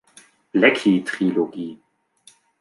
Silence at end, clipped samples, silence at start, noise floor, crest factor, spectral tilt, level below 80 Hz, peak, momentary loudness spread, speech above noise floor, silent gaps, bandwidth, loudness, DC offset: 0.85 s; under 0.1%; 0.55 s; -55 dBFS; 20 dB; -5.5 dB/octave; -72 dBFS; -2 dBFS; 15 LU; 36 dB; none; 11.5 kHz; -19 LUFS; under 0.1%